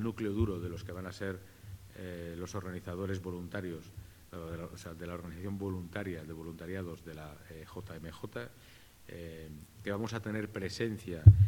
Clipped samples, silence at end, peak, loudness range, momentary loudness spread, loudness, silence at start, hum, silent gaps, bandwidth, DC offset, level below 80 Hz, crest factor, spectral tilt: under 0.1%; 0 s; -6 dBFS; 6 LU; 14 LU; -37 LUFS; 0 s; none; none; 15.5 kHz; under 0.1%; -46 dBFS; 28 dB; -7.5 dB/octave